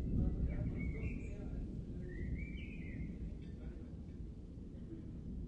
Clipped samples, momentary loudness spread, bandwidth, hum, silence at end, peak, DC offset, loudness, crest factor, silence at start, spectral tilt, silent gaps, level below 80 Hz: under 0.1%; 11 LU; 7.6 kHz; none; 0 s; -24 dBFS; under 0.1%; -45 LUFS; 18 dB; 0 s; -9 dB/octave; none; -46 dBFS